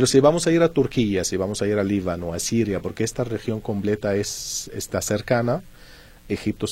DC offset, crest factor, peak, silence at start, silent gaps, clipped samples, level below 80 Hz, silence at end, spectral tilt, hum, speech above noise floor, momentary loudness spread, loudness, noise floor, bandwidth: under 0.1%; 18 dB; -4 dBFS; 0 s; none; under 0.1%; -46 dBFS; 0 s; -5 dB/octave; none; 24 dB; 9 LU; -23 LUFS; -46 dBFS; 16.5 kHz